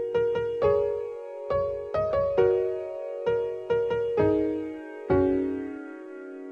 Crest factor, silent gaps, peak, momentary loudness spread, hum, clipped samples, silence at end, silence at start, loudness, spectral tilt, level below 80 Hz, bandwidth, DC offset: 16 dB; none; -10 dBFS; 14 LU; none; under 0.1%; 0 s; 0 s; -27 LUFS; -8.5 dB/octave; -52 dBFS; 6.6 kHz; under 0.1%